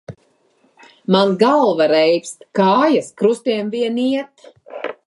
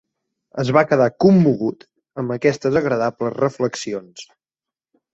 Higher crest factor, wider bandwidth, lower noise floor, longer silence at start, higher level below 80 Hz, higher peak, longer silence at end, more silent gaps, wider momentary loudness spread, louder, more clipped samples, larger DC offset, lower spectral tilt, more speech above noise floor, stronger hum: about the same, 16 dB vs 18 dB; first, 11.5 kHz vs 8 kHz; second, -59 dBFS vs -89 dBFS; second, 0.1 s vs 0.55 s; second, -66 dBFS vs -56 dBFS; about the same, -2 dBFS vs -2 dBFS; second, 0.15 s vs 0.9 s; neither; about the same, 16 LU vs 17 LU; about the same, -16 LUFS vs -18 LUFS; neither; neither; second, -5.5 dB/octave vs -7 dB/octave; second, 43 dB vs 71 dB; neither